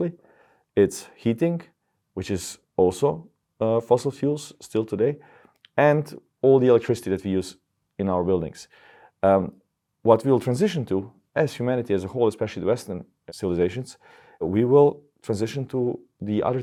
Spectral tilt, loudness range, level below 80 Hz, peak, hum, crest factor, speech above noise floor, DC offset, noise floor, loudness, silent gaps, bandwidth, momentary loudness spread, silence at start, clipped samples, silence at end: -7 dB/octave; 3 LU; -62 dBFS; -2 dBFS; none; 22 dB; 37 dB; under 0.1%; -59 dBFS; -24 LUFS; none; 13.5 kHz; 16 LU; 0 s; under 0.1%; 0 s